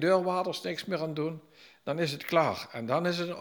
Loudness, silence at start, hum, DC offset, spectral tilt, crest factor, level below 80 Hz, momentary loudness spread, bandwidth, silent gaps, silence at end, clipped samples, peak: -31 LUFS; 0 s; none; under 0.1%; -5.5 dB/octave; 20 dB; -76 dBFS; 9 LU; over 20 kHz; none; 0 s; under 0.1%; -12 dBFS